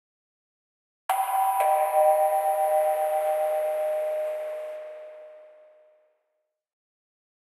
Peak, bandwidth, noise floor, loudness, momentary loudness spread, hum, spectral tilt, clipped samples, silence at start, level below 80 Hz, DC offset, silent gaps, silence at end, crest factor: -10 dBFS; 14.5 kHz; -79 dBFS; -25 LUFS; 17 LU; none; 2 dB/octave; under 0.1%; 1.1 s; under -90 dBFS; under 0.1%; none; 2.05 s; 16 dB